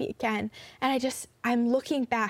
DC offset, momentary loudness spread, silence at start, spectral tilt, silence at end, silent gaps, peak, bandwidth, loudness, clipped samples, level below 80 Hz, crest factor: under 0.1%; 7 LU; 0 s; -4 dB/octave; 0 s; none; -14 dBFS; 16 kHz; -29 LUFS; under 0.1%; -66 dBFS; 16 dB